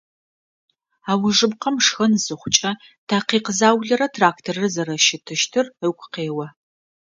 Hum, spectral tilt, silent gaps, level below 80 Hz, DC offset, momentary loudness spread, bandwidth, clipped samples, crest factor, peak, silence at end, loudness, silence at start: none; -3 dB/octave; 2.98-3.07 s; -64 dBFS; under 0.1%; 10 LU; 9.6 kHz; under 0.1%; 22 dB; 0 dBFS; 0.5 s; -19 LUFS; 1.05 s